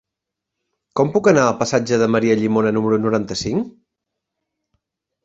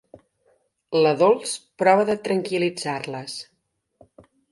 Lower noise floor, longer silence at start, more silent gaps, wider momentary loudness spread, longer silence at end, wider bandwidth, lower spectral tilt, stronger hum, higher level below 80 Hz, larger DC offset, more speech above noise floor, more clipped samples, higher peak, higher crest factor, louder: first, -83 dBFS vs -65 dBFS; about the same, 0.95 s vs 0.9 s; neither; second, 9 LU vs 14 LU; first, 1.55 s vs 1.1 s; second, 8 kHz vs 11.5 kHz; about the same, -5.5 dB/octave vs -4.5 dB/octave; neither; first, -54 dBFS vs -68 dBFS; neither; first, 66 dB vs 44 dB; neither; about the same, -2 dBFS vs -4 dBFS; about the same, 18 dB vs 20 dB; first, -18 LUFS vs -22 LUFS